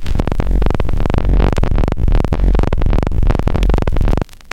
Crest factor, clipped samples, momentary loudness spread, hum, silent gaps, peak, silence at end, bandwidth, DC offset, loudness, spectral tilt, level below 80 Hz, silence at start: 14 dB; under 0.1%; 3 LU; none; none; 0 dBFS; 0 s; 7.6 kHz; 9%; -17 LUFS; -8 dB/octave; -14 dBFS; 0 s